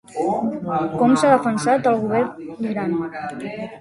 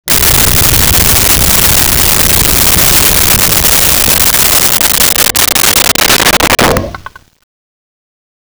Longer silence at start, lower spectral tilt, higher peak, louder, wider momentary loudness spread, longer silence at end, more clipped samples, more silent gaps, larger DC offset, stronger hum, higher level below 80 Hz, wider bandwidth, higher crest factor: about the same, 0.1 s vs 0.05 s; first, -6 dB/octave vs -1.5 dB/octave; about the same, -2 dBFS vs 0 dBFS; second, -20 LUFS vs -5 LUFS; first, 13 LU vs 1 LU; second, 0 s vs 1.45 s; neither; neither; neither; neither; second, -60 dBFS vs -22 dBFS; second, 11.5 kHz vs over 20 kHz; first, 18 dB vs 8 dB